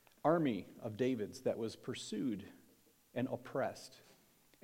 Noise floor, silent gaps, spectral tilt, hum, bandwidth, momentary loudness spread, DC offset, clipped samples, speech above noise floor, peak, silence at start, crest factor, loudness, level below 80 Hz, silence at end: -69 dBFS; none; -6 dB/octave; none; 16.5 kHz; 13 LU; under 0.1%; under 0.1%; 30 dB; -18 dBFS; 0.25 s; 22 dB; -39 LUFS; -82 dBFS; 0.65 s